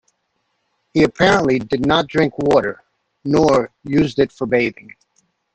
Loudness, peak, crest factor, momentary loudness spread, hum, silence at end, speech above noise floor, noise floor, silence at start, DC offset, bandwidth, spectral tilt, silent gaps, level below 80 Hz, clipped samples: -17 LUFS; 0 dBFS; 18 dB; 9 LU; none; 0.8 s; 53 dB; -70 dBFS; 0.95 s; under 0.1%; 9 kHz; -6 dB/octave; none; -46 dBFS; under 0.1%